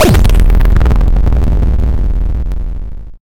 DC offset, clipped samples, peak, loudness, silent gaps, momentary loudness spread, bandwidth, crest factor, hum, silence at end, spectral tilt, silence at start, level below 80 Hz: under 0.1%; under 0.1%; 0 dBFS; -13 LUFS; none; 12 LU; 16.5 kHz; 8 dB; none; 0.05 s; -6.5 dB/octave; 0 s; -10 dBFS